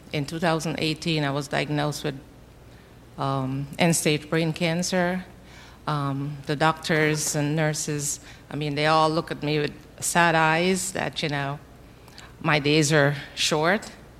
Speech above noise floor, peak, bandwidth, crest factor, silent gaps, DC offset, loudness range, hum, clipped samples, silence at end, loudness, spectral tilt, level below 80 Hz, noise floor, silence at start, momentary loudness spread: 24 dB; -4 dBFS; 15.5 kHz; 22 dB; none; under 0.1%; 4 LU; none; under 0.1%; 0 s; -24 LUFS; -4 dB/octave; -54 dBFS; -48 dBFS; 0 s; 11 LU